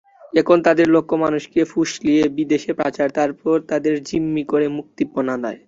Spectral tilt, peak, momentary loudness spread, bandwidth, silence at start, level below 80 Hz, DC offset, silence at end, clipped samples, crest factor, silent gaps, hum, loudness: -6 dB/octave; -2 dBFS; 8 LU; 7.8 kHz; 0.35 s; -56 dBFS; under 0.1%; 0.1 s; under 0.1%; 18 dB; none; none; -19 LUFS